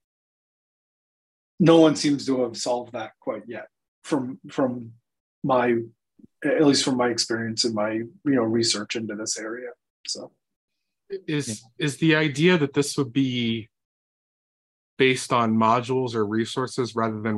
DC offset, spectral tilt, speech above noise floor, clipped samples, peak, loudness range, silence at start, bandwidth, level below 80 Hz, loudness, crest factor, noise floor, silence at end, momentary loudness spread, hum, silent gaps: under 0.1%; -4.5 dB/octave; over 67 dB; under 0.1%; -4 dBFS; 5 LU; 1.6 s; 12.5 kHz; -68 dBFS; -23 LUFS; 20 dB; under -90 dBFS; 0 s; 14 LU; none; 3.88-4.02 s, 5.20-5.42 s, 9.90-10.04 s, 10.56-10.68 s, 13.85-14.97 s